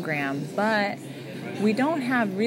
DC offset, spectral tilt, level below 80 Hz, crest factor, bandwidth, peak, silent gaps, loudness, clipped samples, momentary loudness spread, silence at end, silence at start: under 0.1%; -6 dB/octave; -78 dBFS; 16 dB; 16 kHz; -10 dBFS; none; -25 LUFS; under 0.1%; 12 LU; 0 s; 0 s